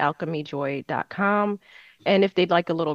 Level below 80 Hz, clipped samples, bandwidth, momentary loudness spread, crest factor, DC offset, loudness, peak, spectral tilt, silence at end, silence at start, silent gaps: -70 dBFS; under 0.1%; 7 kHz; 10 LU; 18 dB; under 0.1%; -24 LUFS; -6 dBFS; -7.5 dB/octave; 0 s; 0 s; none